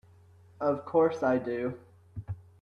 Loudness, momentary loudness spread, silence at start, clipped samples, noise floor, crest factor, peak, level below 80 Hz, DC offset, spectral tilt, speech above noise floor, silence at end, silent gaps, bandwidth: -29 LUFS; 20 LU; 0.6 s; under 0.1%; -57 dBFS; 18 dB; -14 dBFS; -62 dBFS; under 0.1%; -8.5 dB/octave; 29 dB; 0.2 s; none; 6.8 kHz